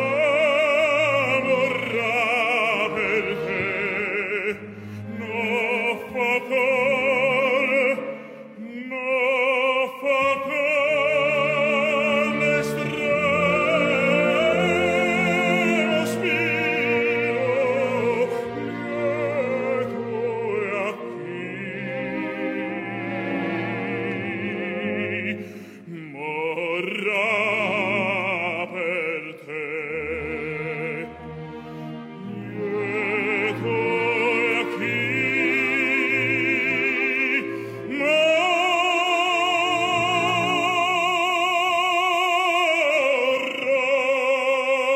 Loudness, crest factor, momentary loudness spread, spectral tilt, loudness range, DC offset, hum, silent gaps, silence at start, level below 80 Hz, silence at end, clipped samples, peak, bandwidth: -22 LUFS; 14 dB; 11 LU; -4.5 dB/octave; 8 LU; under 0.1%; none; none; 0 s; -64 dBFS; 0 s; under 0.1%; -8 dBFS; 15.5 kHz